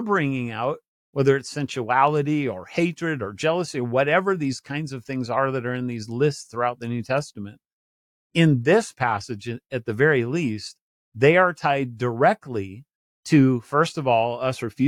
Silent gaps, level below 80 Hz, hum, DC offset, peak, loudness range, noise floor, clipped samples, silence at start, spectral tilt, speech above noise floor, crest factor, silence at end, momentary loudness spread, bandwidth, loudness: 0.88-1.13 s, 7.73-8.30 s, 10.81-11.12 s, 12.95-13.23 s; -66 dBFS; none; under 0.1%; -4 dBFS; 4 LU; under -90 dBFS; under 0.1%; 0 s; -6.5 dB/octave; over 68 dB; 18 dB; 0 s; 12 LU; 12.5 kHz; -23 LUFS